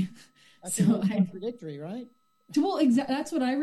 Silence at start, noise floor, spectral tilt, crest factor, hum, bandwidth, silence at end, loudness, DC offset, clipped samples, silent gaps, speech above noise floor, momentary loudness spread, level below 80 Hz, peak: 0 s; -55 dBFS; -6 dB/octave; 16 dB; none; 12.5 kHz; 0 s; -27 LUFS; under 0.1%; under 0.1%; none; 29 dB; 15 LU; -70 dBFS; -12 dBFS